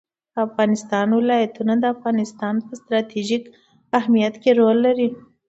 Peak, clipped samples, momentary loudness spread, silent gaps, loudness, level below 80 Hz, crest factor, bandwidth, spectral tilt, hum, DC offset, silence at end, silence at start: -2 dBFS; under 0.1%; 9 LU; none; -20 LUFS; -68 dBFS; 18 dB; 8 kHz; -6 dB/octave; none; under 0.1%; 0.3 s; 0.35 s